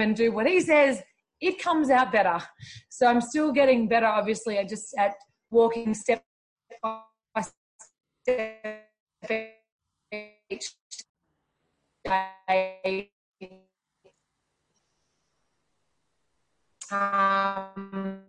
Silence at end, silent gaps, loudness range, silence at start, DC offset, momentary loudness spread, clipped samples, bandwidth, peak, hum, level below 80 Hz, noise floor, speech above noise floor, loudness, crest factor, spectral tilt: 0.1 s; 6.26-6.56 s, 7.57-7.79 s, 9.00-9.07 s, 9.72-9.79 s, 10.81-10.90 s, 11.09-11.15 s, 13.12-13.32 s; 12 LU; 0 s; under 0.1%; 19 LU; under 0.1%; 10.5 kHz; -10 dBFS; none; -66 dBFS; -78 dBFS; 53 dB; -26 LUFS; 18 dB; -4.5 dB/octave